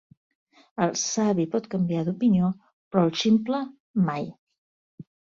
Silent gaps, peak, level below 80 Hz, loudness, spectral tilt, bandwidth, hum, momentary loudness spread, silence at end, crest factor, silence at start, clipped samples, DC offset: 2.73-2.91 s, 3.80-3.94 s, 4.38-4.47 s, 4.58-4.98 s; -8 dBFS; -64 dBFS; -25 LUFS; -5.5 dB/octave; 7.6 kHz; none; 9 LU; 0.35 s; 18 dB; 0.8 s; under 0.1%; under 0.1%